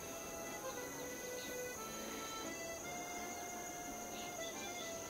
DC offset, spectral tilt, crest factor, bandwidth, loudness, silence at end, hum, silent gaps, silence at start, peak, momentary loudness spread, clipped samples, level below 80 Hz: under 0.1%; -2 dB/octave; 14 dB; 16 kHz; -45 LUFS; 0 s; none; none; 0 s; -32 dBFS; 1 LU; under 0.1%; -68 dBFS